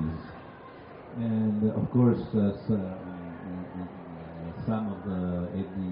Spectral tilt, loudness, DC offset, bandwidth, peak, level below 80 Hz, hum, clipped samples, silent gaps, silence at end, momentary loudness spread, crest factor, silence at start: -9.5 dB/octave; -30 LUFS; under 0.1%; 5.2 kHz; -14 dBFS; -54 dBFS; none; under 0.1%; none; 0 s; 19 LU; 16 dB; 0 s